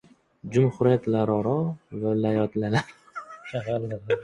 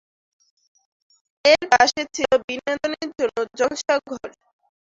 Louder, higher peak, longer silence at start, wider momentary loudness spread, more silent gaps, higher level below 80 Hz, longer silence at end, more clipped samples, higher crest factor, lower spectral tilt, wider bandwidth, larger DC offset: second, -25 LUFS vs -20 LUFS; second, -8 dBFS vs -2 dBFS; second, 0.45 s vs 1.45 s; first, 17 LU vs 11 LU; second, none vs 2.44-2.48 s; about the same, -58 dBFS vs -60 dBFS; second, 0 s vs 0.6 s; neither; about the same, 18 dB vs 22 dB; first, -8 dB/octave vs -1.5 dB/octave; first, 11 kHz vs 7.8 kHz; neither